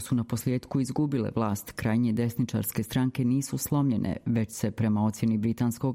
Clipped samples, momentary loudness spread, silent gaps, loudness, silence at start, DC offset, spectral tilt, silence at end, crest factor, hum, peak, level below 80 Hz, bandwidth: under 0.1%; 3 LU; none; -28 LUFS; 0 s; under 0.1%; -6.5 dB/octave; 0 s; 14 dB; none; -14 dBFS; -56 dBFS; 16.5 kHz